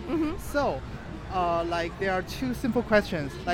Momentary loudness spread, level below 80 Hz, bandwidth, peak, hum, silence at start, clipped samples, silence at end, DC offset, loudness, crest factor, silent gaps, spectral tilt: 9 LU; -42 dBFS; 16.5 kHz; -10 dBFS; none; 0 s; under 0.1%; 0 s; under 0.1%; -28 LUFS; 18 dB; none; -6 dB/octave